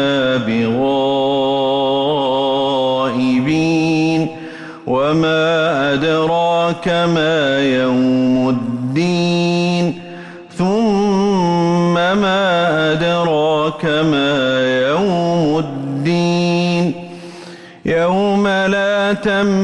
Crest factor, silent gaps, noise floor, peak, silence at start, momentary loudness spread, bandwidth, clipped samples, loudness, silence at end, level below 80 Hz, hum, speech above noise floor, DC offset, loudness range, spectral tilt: 8 dB; none; -35 dBFS; -6 dBFS; 0 s; 6 LU; 10.5 kHz; under 0.1%; -15 LUFS; 0 s; -50 dBFS; none; 21 dB; under 0.1%; 2 LU; -6 dB/octave